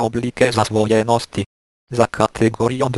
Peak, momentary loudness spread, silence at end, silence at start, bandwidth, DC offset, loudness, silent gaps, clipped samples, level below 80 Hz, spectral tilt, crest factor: 0 dBFS; 10 LU; 0 s; 0 s; 12.5 kHz; under 0.1%; -18 LUFS; 1.46-1.87 s; under 0.1%; -46 dBFS; -5.5 dB/octave; 18 dB